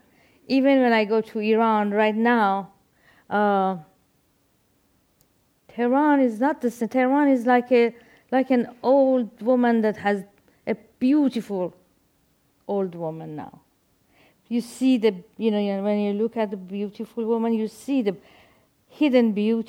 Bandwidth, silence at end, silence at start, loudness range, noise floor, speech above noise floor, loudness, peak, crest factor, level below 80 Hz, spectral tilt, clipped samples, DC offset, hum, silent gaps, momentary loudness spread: 15.5 kHz; 0.05 s; 0.5 s; 7 LU; -65 dBFS; 44 dB; -22 LUFS; -8 dBFS; 16 dB; -72 dBFS; -6.5 dB/octave; under 0.1%; under 0.1%; none; none; 12 LU